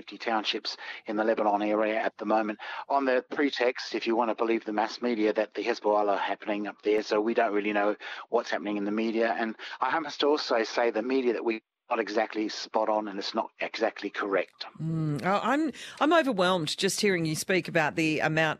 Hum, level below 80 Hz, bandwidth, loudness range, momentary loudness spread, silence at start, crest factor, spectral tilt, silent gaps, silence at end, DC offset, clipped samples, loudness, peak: none; -74 dBFS; 14.5 kHz; 3 LU; 7 LU; 0.05 s; 18 dB; -4.5 dB/octave; none; 0.05 s; under 0.1%; under 0.1%; -28 LUFS; -10 dBFS